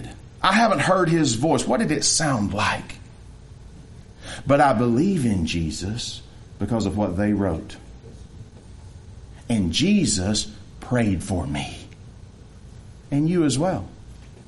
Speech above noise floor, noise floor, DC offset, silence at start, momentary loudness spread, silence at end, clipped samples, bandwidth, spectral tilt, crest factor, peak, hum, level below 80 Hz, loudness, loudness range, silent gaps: 23 dB; -44 dBFS; under 0.1%; 0 s; 22 LU; 0.05 s; under 0.1%; 11.5 kHz; -4.5 dB/octave; 20 dB; -4 dBFS; none; -44 dBFS; -22 LUFS; 6 LU; none